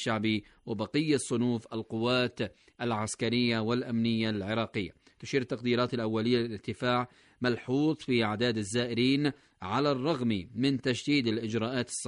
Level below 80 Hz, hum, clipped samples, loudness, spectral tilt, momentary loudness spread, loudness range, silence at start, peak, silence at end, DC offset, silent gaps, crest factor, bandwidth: -64 dBFS; none; under 0.1%; -30 LUFS; -5 dB/octave; 7 LU; 2 LU; 0 s; -14 dBFS; 0 s; under 0.1%; none; 16 dB; 10.5 kHz